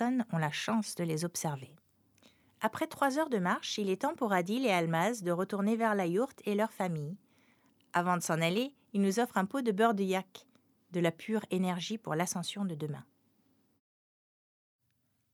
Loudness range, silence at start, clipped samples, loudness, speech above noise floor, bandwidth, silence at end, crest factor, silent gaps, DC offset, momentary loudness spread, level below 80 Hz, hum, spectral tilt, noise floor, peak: 5 LU; 0 s; under 0.1%; -33 LUFS; 45 dB; 19 kHz; 2.3 s; 20 dB; none; under 0.1%; 7 LU; -82 dBFS; none; -5 dB/octave; -77 dBFS; -14 dBFS